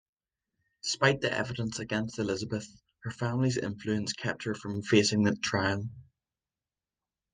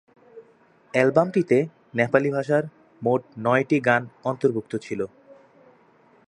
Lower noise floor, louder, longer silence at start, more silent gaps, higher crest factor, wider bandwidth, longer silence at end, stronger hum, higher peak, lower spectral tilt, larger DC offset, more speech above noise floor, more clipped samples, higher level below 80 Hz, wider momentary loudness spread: first, under -90 dBFS vs -57 dBFS; second, -30 LUFS vs -23 LUFS; first, 0.85 s vs 0.35 s; neither; about the same, 22 dB vs 22 dB; second, 9.8 kHz vs 11 kHz; first, 1.3 s vs 0.95 s; neither; second, -10 dBFS vs -2 dBFS; second, -4.5 dB/octave vs -7.5 dB/octave; neither; first, over 60 dB vs 35 dB; neither; about the same, -64 dBFS vs -68 dBFS; about the same, 11 LU vs 11 LU